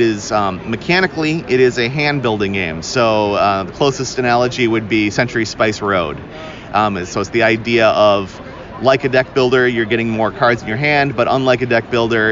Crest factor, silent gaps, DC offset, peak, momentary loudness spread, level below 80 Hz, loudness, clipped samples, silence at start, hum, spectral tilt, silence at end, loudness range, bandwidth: 14 dB; none; under 0.1%; 0 dBFS; 6 LU; -44 dBFS; -15 LUFS; under 0.1%; 0 s; none; -5 dB/octave; 0 s; 2 LU; 7.6 kHz